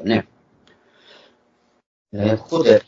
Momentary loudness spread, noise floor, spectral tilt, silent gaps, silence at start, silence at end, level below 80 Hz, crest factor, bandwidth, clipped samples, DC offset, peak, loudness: 20 LU; -62 dBFS; -6.5 dB/octave; 1.86-2.05 s; 0 s; 0.05 s; -58 dBFS; 20 dB; 7.6 kHz; under 0.1%; under 0.1%; 0 dBFS; -20 LUFS